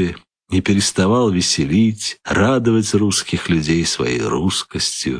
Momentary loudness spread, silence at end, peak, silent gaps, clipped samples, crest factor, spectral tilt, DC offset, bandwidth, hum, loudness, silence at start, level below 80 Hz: 5 LU; 0 s; -4 dBFS; none; under 0.1%; 14 dB; -4.5 dB/octave; under 0.1%; 11 kHz; none; -17 LUFS; 0 s; -42 dBFS